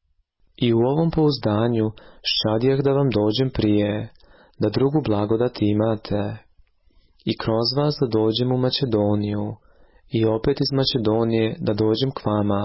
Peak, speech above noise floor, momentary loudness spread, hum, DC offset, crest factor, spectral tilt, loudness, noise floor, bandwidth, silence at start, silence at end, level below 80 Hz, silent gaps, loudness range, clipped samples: -8 dBFS; 42 dB; 8 LU; none; under 0.1%; 14 dB; -10 dB/octave; -21 LUFS; -63 dBFS; 5.8 kHz; 0.6 s; 0 s; -46 dBFS; none; 3 LU; under 0.1%